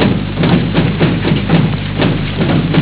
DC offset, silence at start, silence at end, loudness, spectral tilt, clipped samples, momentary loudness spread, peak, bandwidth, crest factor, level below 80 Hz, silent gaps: under 0.1%; 0 s; 0 s; -13 LUFS; -11 dB/octave; under 0.1%; 3 LU; 0 dBFS; 4 kHz; 12 dB; -28 dBFS; none